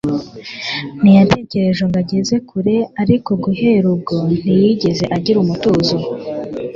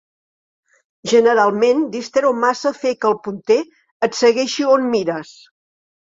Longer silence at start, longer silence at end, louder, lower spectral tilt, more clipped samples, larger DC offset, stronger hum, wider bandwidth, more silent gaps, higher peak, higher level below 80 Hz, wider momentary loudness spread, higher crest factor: second, 0.05 s vs 1.05 s; second, 0 s vs 0.9 s; about the same, -15 LUFS vs -17 LUFS; first, -7 dB/octave vs -4 dB/octave; neither; neither; neither; about the same, 7.4 kHz vs 7.8 kHz; second, none vs 3.91-4.00 s; about the same, 0 dBFS vs 0 dBFS; first, -46 dBFS vs -64 dBFS; first, 12 LU vs 9 LU; about the same, 14 dB vs 18 dB